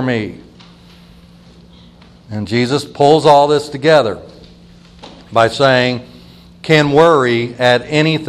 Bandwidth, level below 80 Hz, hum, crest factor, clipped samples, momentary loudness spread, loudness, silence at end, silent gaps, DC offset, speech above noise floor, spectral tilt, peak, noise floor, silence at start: 12.5 kHz; -48 dBFS; none; 14 dB; 0.1%; 16 LU; -12 LUFS; 0 s; none; under 0.1%; 30 dB; -5.5 dB/octave; 0 dBFS; -42 dBFS; 0 s